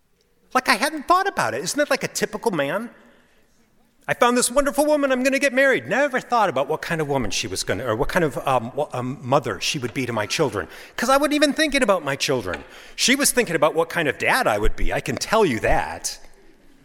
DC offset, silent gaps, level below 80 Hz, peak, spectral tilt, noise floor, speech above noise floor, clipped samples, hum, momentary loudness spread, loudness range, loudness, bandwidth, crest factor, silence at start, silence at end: under 0.1%; none; -36 dBFS; -2 dBFS; -3.5 dB/octave; -61 dBFS; 40 dB; under 0.1%; none; 9 LU; 4 LU; -21 LUFS; 17 kHz; 20 dB; 0.55 s; 0.55 s